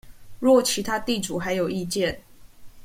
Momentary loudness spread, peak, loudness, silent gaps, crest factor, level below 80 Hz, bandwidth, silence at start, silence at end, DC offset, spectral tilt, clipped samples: 8 LU; -6 dBFS; -24 LUFS; none; 18 dB; -50 dBFS; 16.5 kHz; 0.05 s; 0 s; under 0.1%; -4 dB/octave; under 0.1%